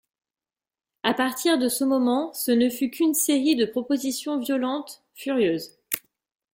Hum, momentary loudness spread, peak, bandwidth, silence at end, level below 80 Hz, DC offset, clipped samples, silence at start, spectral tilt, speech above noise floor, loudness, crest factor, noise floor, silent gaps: none; 9 LU; -6 dBFS; 17 kHz; 0.55 s; -68 dBFS; under 0.1%; under 0.1%; 1.05 s; -3 dB/octave; over 67 dB; -24 LUFS; 20 dB; under -90 dBFS; none